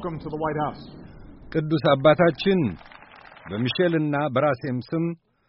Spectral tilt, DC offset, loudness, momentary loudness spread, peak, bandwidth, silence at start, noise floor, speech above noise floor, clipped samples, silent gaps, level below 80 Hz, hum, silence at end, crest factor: -5.5 dB/octave; under 0.1%; -23 LUFS; 15 LU; -6 dBFS; 5.8 kHz; 0 s; -47 dBFS; 24 dB; under 0.1%; none; -52 dBFS; none; 0.35 s; 18 dB